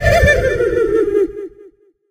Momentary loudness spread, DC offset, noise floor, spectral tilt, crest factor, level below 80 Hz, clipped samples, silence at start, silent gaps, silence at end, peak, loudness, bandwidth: 16 LU; under 0.1%; -45 dBFS; -6 dB/octave; 14 dB; -26 dBFS; under 0.1%; 0 s; none; 0.4 s; 0 dBFS; -15 LUFS; 15.5 kHz